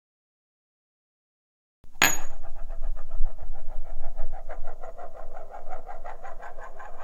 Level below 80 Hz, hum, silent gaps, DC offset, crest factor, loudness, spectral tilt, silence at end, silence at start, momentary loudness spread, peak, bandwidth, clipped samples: -32 dBFS; none; none; under 0.1%; 22 dB; -32 LUFS; -1.5 dB/octave; 0 s; 1.85 s; 21 LU; 0 dBFS; 16 kHz; under 0.1%